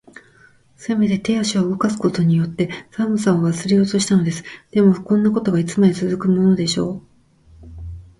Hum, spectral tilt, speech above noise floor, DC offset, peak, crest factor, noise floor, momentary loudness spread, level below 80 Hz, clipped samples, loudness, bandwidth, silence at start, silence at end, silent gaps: none; -6 dB/octave; 34 dB; under 0.1%; -4 dBFS; 16 dB; -52 dBFS; 9 LU; -48 dBFS; under 0.1%; -18 LUFS; 11.5 kHz; 0.8 s; 0.2 s; none